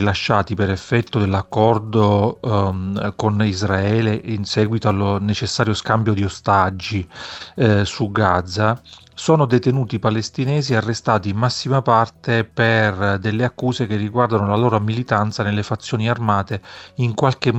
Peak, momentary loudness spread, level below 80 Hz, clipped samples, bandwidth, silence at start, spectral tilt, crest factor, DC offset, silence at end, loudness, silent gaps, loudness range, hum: -2 dBFS; 6 LU; -48 dBFS; under 0.1%; 8.4 kHz; 0 s; -6.5 dB/octave; 18 dB; under 0.1%; 0 s; -19 LUFS; none; 1 LU; none